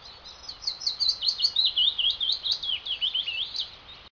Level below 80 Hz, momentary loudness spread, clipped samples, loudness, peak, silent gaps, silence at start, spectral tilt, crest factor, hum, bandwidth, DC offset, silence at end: -60 dBFS; 15 LU; under 0.1%; -24 LUFS; -12 dBFS; none; 0 s; 1 dB/octave; 16 dB; none; 5.4 kHz; under 0.1%; 0.05 s